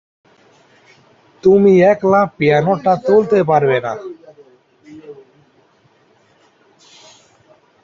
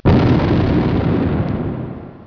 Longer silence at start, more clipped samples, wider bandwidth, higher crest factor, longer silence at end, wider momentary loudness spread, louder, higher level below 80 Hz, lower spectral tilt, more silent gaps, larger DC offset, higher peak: first, 1.45 s vs 0.05 s; neither; first, 7.2 kHz vs 5.4 kHz; about the same, 16 dB vs 14 dB; first, 2.7 s vs 0.05 s; first, 18 LU vs 12 LU; first, -13 LUFS vs -16 LUFS; second, -58 dBFS vs -28 dBFS; second, -8 dB/octave vs -9.5 dB/octave; neither; neither; about the same, -2 dBFS vs -2 dBFS